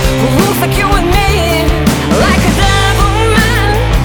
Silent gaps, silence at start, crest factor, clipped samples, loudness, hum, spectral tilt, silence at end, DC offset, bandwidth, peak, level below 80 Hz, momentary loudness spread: none; 0 s; 10 dB; under 0.1%; -10 LUFS; none; -5 dB/octave; 0 s; under 0.1%; over 20 kHz; 0 dBFS; -16 dBFS; 2 LU